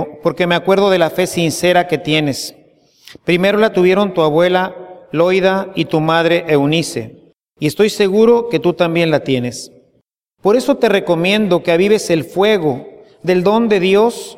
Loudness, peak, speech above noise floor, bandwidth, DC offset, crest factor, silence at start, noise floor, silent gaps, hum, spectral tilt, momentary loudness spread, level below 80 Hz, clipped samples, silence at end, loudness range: -14 LUFS; 0 dBFS; 48 dB; 16 kHz; under 0.1%; 14 dB; 0 s; -62 dBFS; none; none; -5.5 dB/octave; 11 LU; -54 dBFS; under 0.1%; 0 s; 2 LU